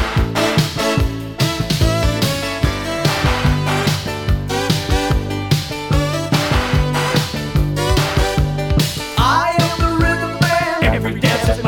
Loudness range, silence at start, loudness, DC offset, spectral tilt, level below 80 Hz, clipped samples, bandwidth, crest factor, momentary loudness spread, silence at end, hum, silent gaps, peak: 2 LU; 0 s; -17 LUFS; under 0.1%; -5 dB/octave; -24 dBFS; under 0.1%; 19 kHz; 16 dB; 4 LU; 0 s; none; none; 0 dBFS